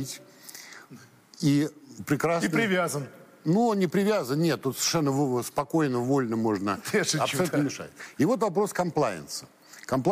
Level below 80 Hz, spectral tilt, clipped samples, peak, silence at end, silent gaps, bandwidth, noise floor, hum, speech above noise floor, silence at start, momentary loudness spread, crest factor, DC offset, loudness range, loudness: -66 dBFS; -5 dB/octave; under 0.1%; -12 dBFS; 0 s; none; 15.5 kHz; -51 dBFS; none; 25 dB; 0 s; 17 LU; 16 dB; under 0.1%; 2 LU; -26 LUFS